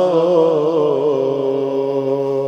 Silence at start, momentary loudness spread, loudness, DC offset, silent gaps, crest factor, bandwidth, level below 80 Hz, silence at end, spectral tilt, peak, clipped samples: 0 s; 5 LU; -16 LUFS; under 0.1%; none; 14 dB; 7.8 kHz; -70 dBFS; 0 s; -8 dB/octave; -2 dBFS; under 0.1%